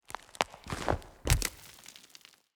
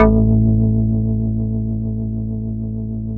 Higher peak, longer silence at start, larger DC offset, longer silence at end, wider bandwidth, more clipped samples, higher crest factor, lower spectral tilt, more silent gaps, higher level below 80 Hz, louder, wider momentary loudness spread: second, -6 dBFS vs 0 dBFS; about the same, 0.1 s vs 0 s; neither; first, 0.55 s vs 0 s; first, over 20 kHz vs 2.6 kHz; neither; first, 30 dB vs 16 dB; second, -3.5 dB/octave vs -13.5 dB/octave; neither; second, -42 dBFS vs -24 dBFS; second, -34 LUFS vs -19 LUFS; first, 21 LU vs 10 LU